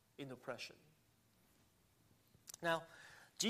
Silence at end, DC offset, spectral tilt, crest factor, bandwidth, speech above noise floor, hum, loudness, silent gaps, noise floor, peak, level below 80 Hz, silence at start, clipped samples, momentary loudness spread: 0 s; under 0.1%; -2.5 dB/octave; 24 dB; 15 kHz; 29 dB; none; -45 LUFS; none; -74 dBFS; -24 dBFS; -86 dBFS; 0.2 s; under 0.1%; 18 LU